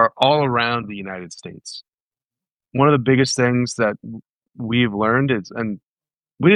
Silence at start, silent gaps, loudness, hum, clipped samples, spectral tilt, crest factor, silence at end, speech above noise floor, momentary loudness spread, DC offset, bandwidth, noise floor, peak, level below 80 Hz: 0 s; 1.94-2.11 s, 2.54-2.58 s, 4.32-4.41 s, 5.83-5.96 s; -19 LUFS; none; under 0.1%; -5.5 dB/octave; 18 dB; 0 s; over 71 dB; 19 LU; under 0.1%; 11 kHz; under -90 dBFS; 0 dBFS; -58 dBFS